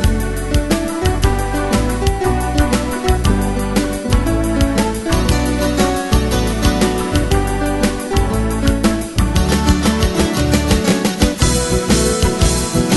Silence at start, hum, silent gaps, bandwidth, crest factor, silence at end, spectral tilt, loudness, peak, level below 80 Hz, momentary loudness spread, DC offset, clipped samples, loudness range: 0 s; none; none; 12.5 kHz; 14 dB; 0 s; -5 dB/octave; -16 LUFS; 0 dBFS; -20 dBFS; 3 LU; under 0.1%; under 0.1%; 2 LU